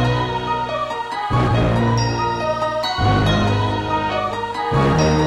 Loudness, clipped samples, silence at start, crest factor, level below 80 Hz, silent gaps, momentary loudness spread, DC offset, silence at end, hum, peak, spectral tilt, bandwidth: -19 LUFS; under 0.1%; 0 s; 12 dB; -32 dBFS; none; 7 LU; under 0.1%; 0 s; none; -6 dBFS; -6.5 dB/octave; 12 kHz